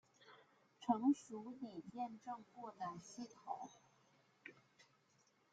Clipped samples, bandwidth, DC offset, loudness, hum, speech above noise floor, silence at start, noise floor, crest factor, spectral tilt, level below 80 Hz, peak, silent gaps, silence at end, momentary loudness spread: under 0.1%; 9 kHz; under 0.1%; -45 LUFS; none; 32 dB; 0.2 s; -77 dBFS; 24 dB; -5.5 dB/octave; under -90 dBFS; -24 dBFS; none; 0.7 s; 22 LU